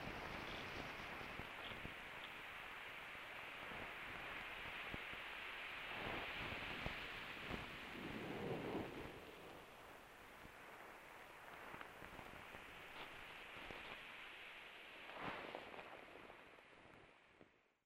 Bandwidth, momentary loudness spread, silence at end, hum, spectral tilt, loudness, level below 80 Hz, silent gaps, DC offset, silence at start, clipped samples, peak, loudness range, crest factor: 16 kHz; 12 LU; 0.25 s; none; -4.5 dB/octave; -51 LUFS; -68 dBFS; none; under 0.1%; 0 s; under 0.1%; -28 dBFS; 8 LU; 24 dB